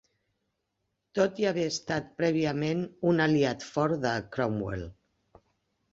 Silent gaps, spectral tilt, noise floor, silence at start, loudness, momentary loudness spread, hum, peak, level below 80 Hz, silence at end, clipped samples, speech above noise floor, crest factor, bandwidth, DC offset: none; -6 dB/octave; -81 dBFS; 1.15 s; -29 LUFS; 8 LU; none; -12 dBFS; -58 dBFS; 1 s; under 0.1%; 53 dB; 18 dB; 8 kHz; under 0.1%